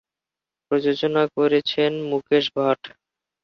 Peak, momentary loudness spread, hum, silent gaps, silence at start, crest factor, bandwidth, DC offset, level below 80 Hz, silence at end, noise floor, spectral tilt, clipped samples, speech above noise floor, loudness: -6 dBFS; 6 LU; none; none; 0.7 s; 16 dB; 6.6 kHz; under 0.1%; -68 dBFS; 0.55 s; -89 dBFS; -6.5 dB/octave; under 0.1%; 68 dB; -21 LUFS